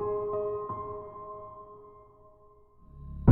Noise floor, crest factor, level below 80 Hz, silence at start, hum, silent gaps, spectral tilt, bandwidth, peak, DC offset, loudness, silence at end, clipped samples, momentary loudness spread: -58 dBFS; 26 dB; -52 dBFS; 0 s; none; none; -13.5 dB/octave; 3.1 kHz; -4 dBFS; under 0.1%; -35 LUFS; 0 s; under 0.1%; 22 LU